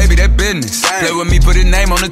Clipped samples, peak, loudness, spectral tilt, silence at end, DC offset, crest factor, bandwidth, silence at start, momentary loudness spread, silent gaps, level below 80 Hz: under 0.1%; 0 dBFS; -12 LUFS; -4 dB/octave; 0 s; under 0.1%; 10 dB; 15.5 kHz; 0 s; 3 LU; none; -12 dBFS